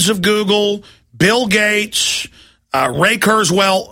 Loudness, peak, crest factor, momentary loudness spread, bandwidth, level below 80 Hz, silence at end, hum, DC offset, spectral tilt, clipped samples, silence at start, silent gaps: -14 LUFS; 0 dBFS; 14 dB; 8 LU; 16.5 kHz; -48 dBFS; 0.05 s; none; under 0.1%; -3 dB/octave; under 0.1%; 0 s; none